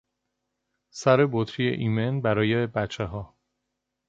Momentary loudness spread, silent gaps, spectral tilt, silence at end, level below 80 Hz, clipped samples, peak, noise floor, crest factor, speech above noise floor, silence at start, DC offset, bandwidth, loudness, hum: 12 LU; none; -6.5 dB/octave; 0.8 s; -54 dBFS; under 0.1%; -6 dBFS; -81 dBFS; 20 dB; 57 dB; 0.95 s; under 0.1%; 7.8 kHz; -25 LUFS; none